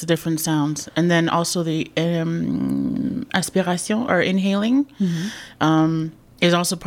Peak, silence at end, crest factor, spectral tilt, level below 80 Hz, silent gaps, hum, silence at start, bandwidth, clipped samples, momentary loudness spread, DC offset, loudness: -4 dBFS; 0 s; 18 dB; -5 dB/octave; -54 dBFS; none; none; 0 s; 16.5 kHz; under 0.1%; 5 LU; under 0.1%; -21 LUFS